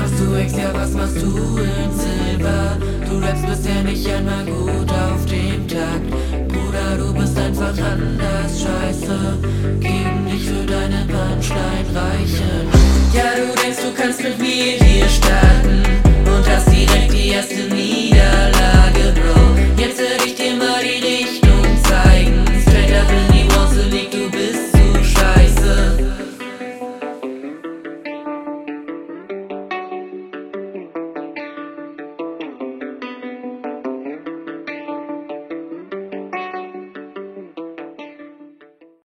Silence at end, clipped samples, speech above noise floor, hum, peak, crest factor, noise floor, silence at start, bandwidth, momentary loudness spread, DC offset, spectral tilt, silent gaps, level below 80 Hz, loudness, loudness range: 0.8 s; under 0.1%; 33 dB; none; 0 dBFS; 16 dB; -48 dBFS; 0 s; 16 kHz; 18 LU; under 0.1%; -5.5 dB/octave; none; -18 dBFS; -16 LUFS; 16 LU